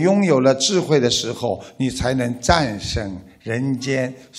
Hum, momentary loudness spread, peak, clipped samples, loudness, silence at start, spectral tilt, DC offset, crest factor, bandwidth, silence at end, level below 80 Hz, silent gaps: none; 10 LU; 0 dBFS; under 0.1%; -19 LUFS; 0 s; -4.5 dB/octave; under 0.1%; 18 dB; 15.5 kHz; 0 s; -38 dBFS; none